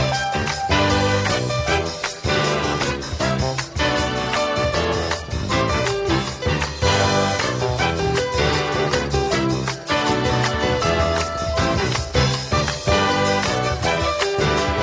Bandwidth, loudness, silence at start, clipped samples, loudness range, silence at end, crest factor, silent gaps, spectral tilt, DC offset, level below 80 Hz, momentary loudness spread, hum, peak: 8 kHz; -20 LUFS; 0 s; under 0.1%; 2 LU; 0 s; 16 dB; none; -4.5 dB/octave; under 0.1%; -32 dBFS; 4 LU; none; -4 dBFS